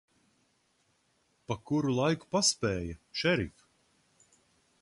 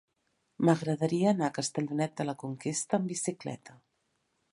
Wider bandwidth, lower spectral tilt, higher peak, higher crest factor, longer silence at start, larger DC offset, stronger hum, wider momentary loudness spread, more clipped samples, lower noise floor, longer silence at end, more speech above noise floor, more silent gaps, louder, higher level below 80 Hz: about the same, 11.5 kHz vs 11.5 kHz; second, -4 dB/octave vs -5.5 dB/octave; second, -14 dBFS vs -10 dBFS; about the same, 20 dB vs 22 dB; first, 1.5 s vs 0.6 s; neither; neither; first, 12 LU vs 9 LU; neither; second, -73 dBFS vs -77 dBFS; first, 1.35 s vs 0.8 s; second, 42 dB vs 47 dB; neither; about the same, -30 LUFS vs -31 LUFS; first, -56 dBFS vs -76 dBFS